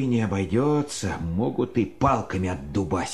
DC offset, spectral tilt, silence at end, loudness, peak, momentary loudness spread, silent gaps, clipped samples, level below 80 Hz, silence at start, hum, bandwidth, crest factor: 0.4%; -6.5 dB/octave; 0 s; -25 LUFS; -6 dBFS; 6 LU; none; under 0.1%; -40 dBFS; 0 s; none; 13 kHz; 18 dB